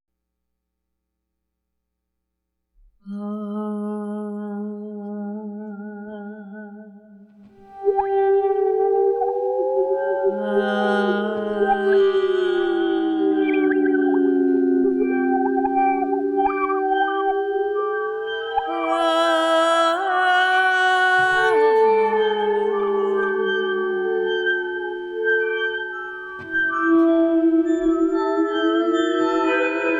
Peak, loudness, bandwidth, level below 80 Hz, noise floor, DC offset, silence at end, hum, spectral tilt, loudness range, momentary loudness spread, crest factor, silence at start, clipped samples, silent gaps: -10 dBFS; -20 LUFS; 11 kHz; -58 dBFS; -79 dBFS; under 0.1%; 0 s; none; -5 dB/octave; 13 LU; 14 LU; 12 dB; 3.05 s; under 0.1%; none